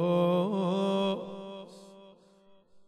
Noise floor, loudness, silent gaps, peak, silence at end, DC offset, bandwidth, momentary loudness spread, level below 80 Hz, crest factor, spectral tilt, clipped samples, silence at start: -60 dBFS; -29 LUFS; none; -16 dBFS; 0.1 s; under 0.1%; 12 kHz; 21 LU; -78 dBFS; 16 dB; -7.5 dB/octave; under 0.1%; 0 s